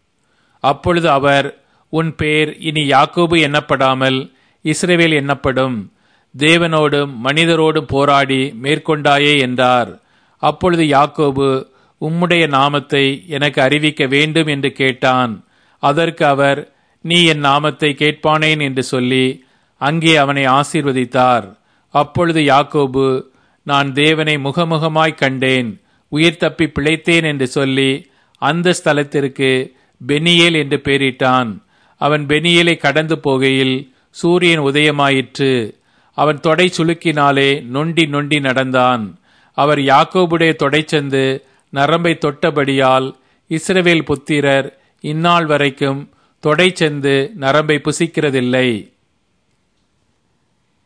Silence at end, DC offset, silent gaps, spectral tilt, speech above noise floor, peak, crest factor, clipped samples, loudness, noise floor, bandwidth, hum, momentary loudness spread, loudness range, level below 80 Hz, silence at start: 2.05 s; under 0.1%; none; -5 dB/octave; 49 dB; 0 dBFS; 14 dB; under 0.1%; -14 LUFS; -63 dBFS; 11 kHz; none; 8 LU; 2 LU; -50 dBFS; 0.65 s